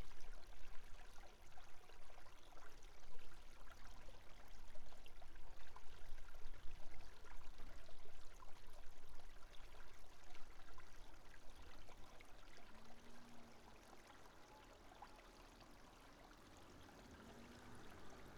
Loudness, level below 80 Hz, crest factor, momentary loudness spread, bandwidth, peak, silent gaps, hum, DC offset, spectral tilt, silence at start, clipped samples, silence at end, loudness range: -64 LUFS; -58 dBFS; 12 dB; 4 LU; 12.5 kHz; -32 dBFS; none; none; under 0.1%; -4 dB/octave; 0 s; under 0.1%; 0 s; 1 LU